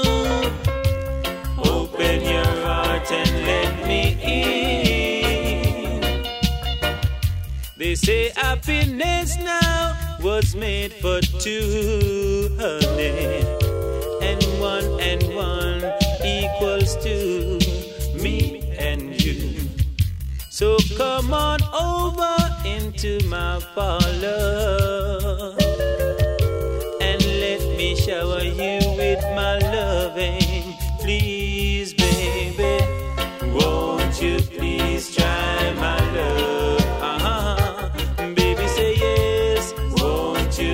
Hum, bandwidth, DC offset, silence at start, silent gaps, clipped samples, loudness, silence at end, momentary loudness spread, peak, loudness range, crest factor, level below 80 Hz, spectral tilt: none; 16.5 kHz; under 0.1%; 0 s; none; under 0.1%; -21 LUFS; 0 s; 6 LU; -2 dBFS; 2 LU; 18 dB; -26 dBFS; -5 dB/octave